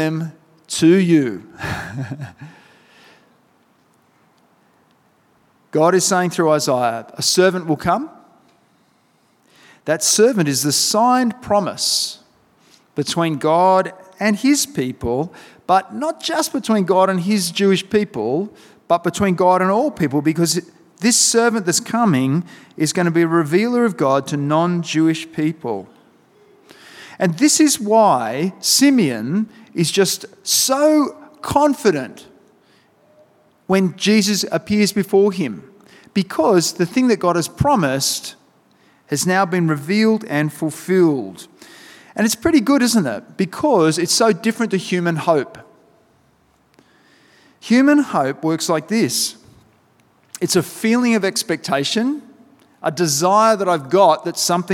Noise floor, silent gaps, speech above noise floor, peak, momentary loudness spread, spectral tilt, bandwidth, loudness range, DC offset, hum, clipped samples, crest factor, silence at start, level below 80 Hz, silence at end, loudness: -59 dBFS; none; 42 dB; -2 dBFS; 11 LU; -4 dB/octave; 18 kHz; 4 LU; under 0.1%; none; under 0.1%; 18 dB; 0 s; -54 dBFS; 0 s; -17 LUFS